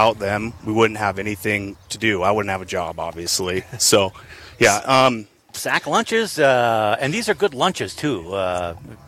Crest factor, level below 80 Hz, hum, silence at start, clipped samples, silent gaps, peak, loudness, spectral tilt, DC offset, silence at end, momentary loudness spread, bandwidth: 18 dB; -50 dBFS; none; 0 s; under 0.1%; none; -2 dBFS; -20 LUFS; -3.5 dB/octave; under 0.1%; 0.1 s; 10 LU; 16.5 kHz